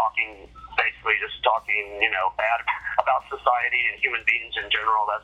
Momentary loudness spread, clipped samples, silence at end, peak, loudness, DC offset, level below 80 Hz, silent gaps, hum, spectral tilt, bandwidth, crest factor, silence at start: 4 LU; under 0.1%; 0 s; -4 dBFS; -23 LUFS; under 0.1%; -54 dBFS; none; none; -3 dB/octave; 9.4 kHz; 22 dB; 0 s